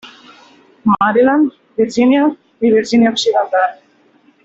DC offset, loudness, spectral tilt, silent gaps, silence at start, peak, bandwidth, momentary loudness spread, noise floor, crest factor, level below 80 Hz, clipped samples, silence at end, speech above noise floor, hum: under 0.1%; -14 LUFS; -5 dB/octave; none; 0.05 s; -2 dBFS; 8 kHz; 7 LU; -52 dBFS; 14 dB; -56 dBFS; under 0.1%; 0.7 s; 39 dB; none